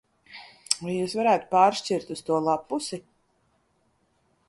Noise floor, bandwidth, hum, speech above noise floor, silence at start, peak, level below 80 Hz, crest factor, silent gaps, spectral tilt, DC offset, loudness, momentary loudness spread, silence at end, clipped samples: -69 dBFS; 11.5 kHz; none; 44 dB; 0.3 s; -2 dBFS; -70 dBFS; 26 dB; none; -4 dB/octave; under 0.1%; -25 LUFS; 23 LU; 1.5 s; under 0.1%